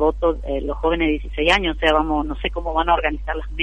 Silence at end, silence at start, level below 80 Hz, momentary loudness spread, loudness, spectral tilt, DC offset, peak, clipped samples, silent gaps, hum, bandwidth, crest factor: 0 s; 0 s; -28 dBFS; 8 LU; -20 LUFS; -5.5 dB/octave; 0.5%; -2 dBFS; under 0.1%; none; none; 10 kHz; 18 dB